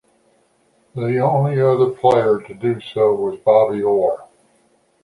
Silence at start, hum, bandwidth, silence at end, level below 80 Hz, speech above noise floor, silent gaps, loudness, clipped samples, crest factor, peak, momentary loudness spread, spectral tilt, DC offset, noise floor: 0.95 s; none; 11 kHz; 0.8 s; -58 dBFS; 43 dB; none; -17 LUFS; under 0.1%; 16 dB; -2 dBFS; 8 LU; -8.5 dB/octave; under 0.1%; -60 dBFS